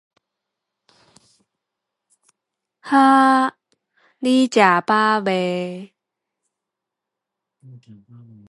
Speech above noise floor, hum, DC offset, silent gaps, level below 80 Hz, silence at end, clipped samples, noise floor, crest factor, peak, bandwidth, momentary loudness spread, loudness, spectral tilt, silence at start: 67 dB; none; under 0.1%; none; -74 dBFS; 2.65 s; under 0.1%; -84 dBFS; 20 dB; 0 dBFS; 11.5 kHz; 13 LU; -17 LUFS; -5 dB/octave; 2.85 s